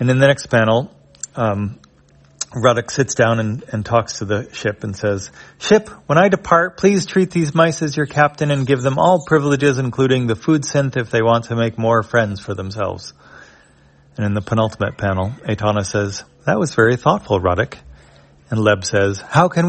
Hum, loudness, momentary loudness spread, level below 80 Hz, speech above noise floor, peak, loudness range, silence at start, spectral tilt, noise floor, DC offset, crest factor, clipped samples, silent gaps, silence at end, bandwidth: none; -17 LUFS; 10 LU; -50 dBFS; 34 dB; 0 dBFS; 6 LU; 0 s; -5.5 dB/octave; -50 dBFS; under 0.1%; 16 dB; under 0.1%; none; 0 s; 8.8 kHz